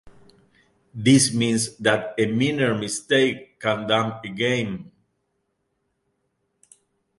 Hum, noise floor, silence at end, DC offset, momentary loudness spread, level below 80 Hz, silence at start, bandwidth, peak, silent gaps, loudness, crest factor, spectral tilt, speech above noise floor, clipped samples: none; -74 dBFS; 2.35 s; under 0.1%; 11 LU; -60 dBFS; 0.05 s; 11.5 kHz; -2 dBFS; none; -22 LUFS; 22 dB; -4 dB/octave; 52 dB; under 0.1%